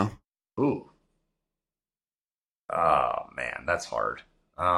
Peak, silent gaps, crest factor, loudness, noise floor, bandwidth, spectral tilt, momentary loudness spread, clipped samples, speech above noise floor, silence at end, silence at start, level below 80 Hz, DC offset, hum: -8 dBFS; 2.21-2.28 s, 2.34-2.38 s, 2.45-2.64 s; 22 dB; -28 LUFS; under -90 dBFS; 12.5 kHz; -6 dB/octave; 15 LU; under 0.1%; over 62 dB; 0 s; 0 s; -58 dBFS; under 0.1%; none